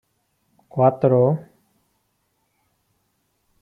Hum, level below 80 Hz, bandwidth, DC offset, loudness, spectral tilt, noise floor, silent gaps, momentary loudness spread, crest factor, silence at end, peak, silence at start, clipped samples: none; -68 dBFS; 3.6 kHz; under 0.1%; -19 LUFS; -11.5 dB/octave; -70 dBFS; none; 12 LU; 20 dB; 2.2 s; -4 dBFS; 0.75 s; under 0.1%